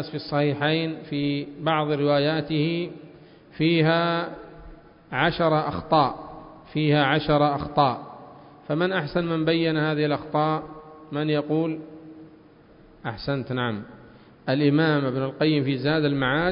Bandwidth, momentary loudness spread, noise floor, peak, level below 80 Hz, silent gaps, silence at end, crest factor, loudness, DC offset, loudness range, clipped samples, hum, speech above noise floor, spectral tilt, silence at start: 5.4 kHz; 15 LU; -51 dBFS; -4 dBFS; -52 dBFS; none; 0 s; 20 dB; -24 LUFS; under 0.1%; 6 LU; under 0.1%; none; 28 dB; -11 dB/octave; 0 s